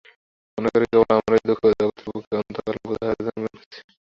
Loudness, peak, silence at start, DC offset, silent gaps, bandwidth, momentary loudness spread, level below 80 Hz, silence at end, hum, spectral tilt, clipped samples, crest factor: -22 LUFS; -4 dBFS; 0.55 s; under 0.1%; 2.27-2.31 s, 3.66-3.71 s; 7.2 kHz; 14 LU; -54 dBFS; 0.35 s; none; -7.5 dB/octave; under 0.1%; 18 dB